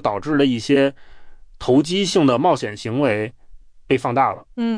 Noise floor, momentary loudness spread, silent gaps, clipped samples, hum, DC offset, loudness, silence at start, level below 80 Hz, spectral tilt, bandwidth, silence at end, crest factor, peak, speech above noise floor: -42 dBFS; 8 LU; none; under 0.1%; none; under 0.1%; -19 LUFS; 0 s; -48 dBFS; -5.5 dB/octave; 10.5 kHz; 0 s; 14 dB; -4 dBFS; 23 dB